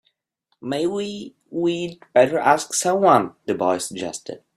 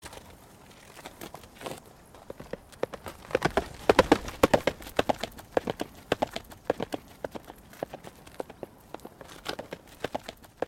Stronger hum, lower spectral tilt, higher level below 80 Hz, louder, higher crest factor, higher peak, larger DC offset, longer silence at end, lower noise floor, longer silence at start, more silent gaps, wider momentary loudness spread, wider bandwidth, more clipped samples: neither; about the same, -4 dB/octave vs -4.5 dB/octave; second, -64 dBFS vs -50 dBFS; first, -21 LUFS vs -31 LUFS; second, 20 dB vs 26 dB; first, -2 dBFS vs -6 dBFS; neither; first, 0.2 s vs 0 s; first, -72 dBFS vs -52 dBFS; first, 0.65 s vs 0.05 s; neither; second, 14 LU vs 23 LU; about the same, 15 kHz vs 16.5 kHz; neither